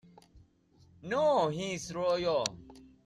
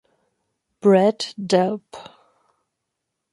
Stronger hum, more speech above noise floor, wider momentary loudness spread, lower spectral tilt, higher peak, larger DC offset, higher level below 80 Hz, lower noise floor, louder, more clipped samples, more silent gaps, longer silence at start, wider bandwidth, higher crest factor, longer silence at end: neither; second, 33 dB vs 61 dB; second, 12 LU vs 22 LU; second, -4 dB/octave vs -6 dB/octave; second, -12 dBFS vs -4 dBFS; neither; first, -64 dBFS vs -72 dBFS; second, -64 dBFS vs -80 dBFS; second, -31 LUFS vs -19 LUFS; neither; neither; second, 0.35 s vs 0.85 s; about the same, 12.5 kHz vs 11.5 kHz; about the same, 22 dB vs 20 dB; second, 0.2 s vs 1.3 s